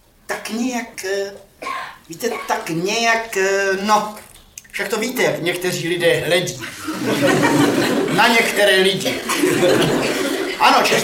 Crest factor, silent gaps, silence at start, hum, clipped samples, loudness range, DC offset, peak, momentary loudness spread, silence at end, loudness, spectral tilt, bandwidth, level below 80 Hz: 16 dB; none; 0.3 s; none; under 0.1%; 6 LU; under 0.1%; -2 dBFS; 14 LU; 0 s; -17 LUFS; -3.5 dB/octave; 17 kHz; -54 dBFS